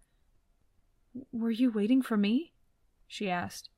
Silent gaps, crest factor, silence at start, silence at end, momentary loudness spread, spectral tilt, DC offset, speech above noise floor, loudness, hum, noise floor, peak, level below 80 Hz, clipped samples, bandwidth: none; 16 dB; 1.15 s; 0.15 s; 21 LU; -6 dB/octave; under 0.1%; 39 dB; -30 LUFS; none; -69 dBFS; -16 dBFS; -70 dBFS; under 0.1%; 14 kHz